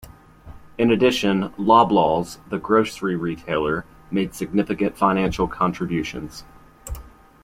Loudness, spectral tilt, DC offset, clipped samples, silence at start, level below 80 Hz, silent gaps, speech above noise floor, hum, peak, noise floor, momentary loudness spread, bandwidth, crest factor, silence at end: -21 LUFS; -6 dB/octave; under 0.1%; under 0.1%; 0.05 s; -44 dBFS; none; 23 dB; none; -2 dBFS; -43 dBFS; 20 LU; 16 kHz; 20 dB; 0.35 s